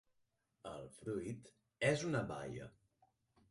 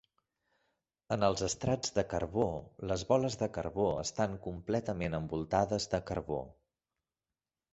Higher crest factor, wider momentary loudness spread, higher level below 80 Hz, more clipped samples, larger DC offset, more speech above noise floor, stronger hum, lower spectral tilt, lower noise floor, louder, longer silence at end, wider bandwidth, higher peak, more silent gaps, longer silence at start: about the same, 22 dB vs 22 dB; first, 16 LU vs 7 LU; second, -70 dBFS vs -54 dBFS; neither; neither; second, 41 dB vs over 56 dB; neither; about the same, -5.5 dB/octave vs -5 dB/octave; second, -82 dBFS vs under -90 dBFS; second, -42 LUFS vs -34 LUFS; second, 0.8 s vs 1.2 s; first, 11.5 kHz vs 8.2 kHz; second, -22 dBFS vs -14 dBFS; neither; second, 0.65 s vs 1.1 s